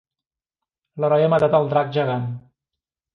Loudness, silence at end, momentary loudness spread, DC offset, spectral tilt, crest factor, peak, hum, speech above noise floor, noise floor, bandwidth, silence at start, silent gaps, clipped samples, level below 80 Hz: -19 LUFS; 0.75 s; 12 LU; under 0.1%; -8.5 dB/octave; 16 dB; -6 dBFS; none; 70 dB; -89 dBFS; 5.8 kHz; 0.95 s; none; under 0.1%; -60 dBFS